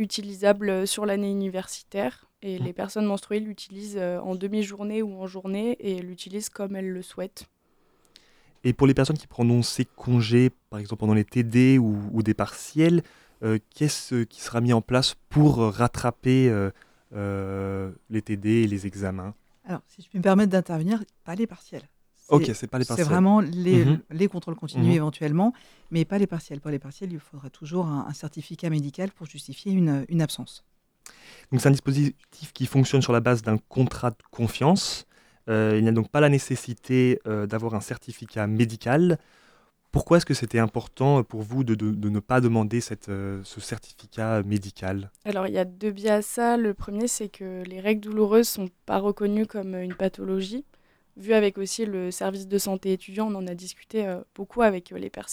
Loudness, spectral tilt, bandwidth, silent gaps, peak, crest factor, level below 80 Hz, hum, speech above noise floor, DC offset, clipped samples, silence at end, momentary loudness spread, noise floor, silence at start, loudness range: -25 LUFS; -6.5 dB/octave; over 20 kHz; none; -4 dBFS; 20 dB; -52 dBFS; none; 39 dB; under 0.1%; under 0.1%; 0 s; 15 LU; -64 dBFS; 0 s; 7 LU